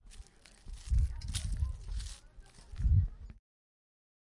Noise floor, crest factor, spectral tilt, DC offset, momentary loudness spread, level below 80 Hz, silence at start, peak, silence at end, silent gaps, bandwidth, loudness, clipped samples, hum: -55 dBFS; 18 dB; -5 dB/octave; under 0.1%; 25 LU; -38 dBFS; 0.05 s; -18 dBFS; 1.05 s; none; 11.5 kHz; -36 LUFS; under 0.1%; none